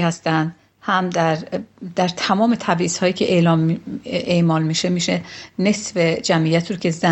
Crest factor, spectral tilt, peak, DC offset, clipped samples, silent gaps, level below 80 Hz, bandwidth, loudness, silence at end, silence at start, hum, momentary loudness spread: 18 dB; -5 dB/octave; -2 dBFS; under 0.1%; under 0.1%; none; -56 dBFS; 8.4 kHz; -19 LUFS; 0 s; 0 s; none; 9 LU